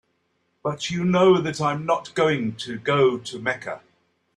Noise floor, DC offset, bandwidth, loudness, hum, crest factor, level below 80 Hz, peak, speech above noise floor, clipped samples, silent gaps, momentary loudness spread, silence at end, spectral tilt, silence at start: -70 dBFS; under 0.1%; 10.5 kHz; -22 LUFS; none; 16 dB; -62 dBFS; -6 dBFS; 48 dB; under 0.1%; none; 13 LU; 0.6 s; -5.5 dB/octave; 0.65 s